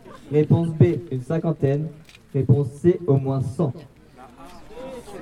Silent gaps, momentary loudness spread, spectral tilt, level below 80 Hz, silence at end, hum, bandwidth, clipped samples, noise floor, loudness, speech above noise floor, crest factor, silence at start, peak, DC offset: none; 18 LU; -9.5 dB/octave; -54 dBFS; 0 s; none; 11 kHz; under 0.1%; -46 dBFS; -22 LUFS; 26 dB; 20 dB; 0.05 s; -4 dBFS; under 0.1%